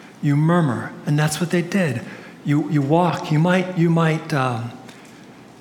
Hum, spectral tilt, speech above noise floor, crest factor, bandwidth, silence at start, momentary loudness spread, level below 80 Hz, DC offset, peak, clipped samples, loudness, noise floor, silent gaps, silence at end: none; -6.5 dB/octave; 24 dB; 16 dB; 15 kHz; 0 s; 12 LU; -66 dBFS; under 0.1%; -4 dBFS; under 0.1%; -20 LUFS; -43 dBFS; none; 0.15 s